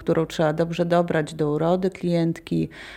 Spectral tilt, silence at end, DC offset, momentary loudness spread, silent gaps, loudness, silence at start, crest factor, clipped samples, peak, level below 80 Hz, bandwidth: -7 dB/octave; 0 s; under 0.1%; 4 LU; none; -23 LUFS; 0 s; 16 dB; under 0.1%; -6 dBFS; -52 dBFS; 12.5 kHz